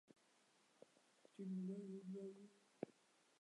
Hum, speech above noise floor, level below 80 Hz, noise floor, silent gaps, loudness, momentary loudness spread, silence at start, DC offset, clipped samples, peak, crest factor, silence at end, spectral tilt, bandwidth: none; 27 dB; under -90 dBFS; -77 dBFS; none; -53 LUFS; 16 LU; 0.1 s; under 0.1%; under 0.1%; -30 dBFS; 24 dB; 0.5 s; -8 dB/octave; 11 kHz